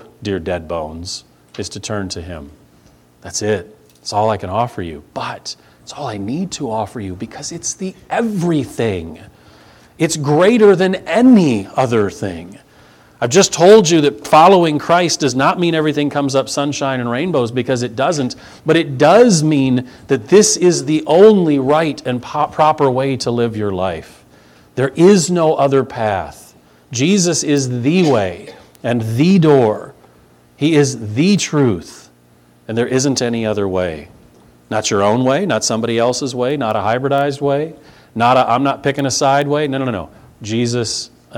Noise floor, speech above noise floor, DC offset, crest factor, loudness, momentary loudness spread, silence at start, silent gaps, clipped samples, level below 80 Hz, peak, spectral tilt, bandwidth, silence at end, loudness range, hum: -49 dBFS; 35 dB; under 0.1%; 16 dB; -15 LUFS; 16 LU; 0.2 s; none; under 0.1%; -50 dBFS; 0 dBFS; -5 dB/octave; 16 kHz; 0 s; 10 LU; none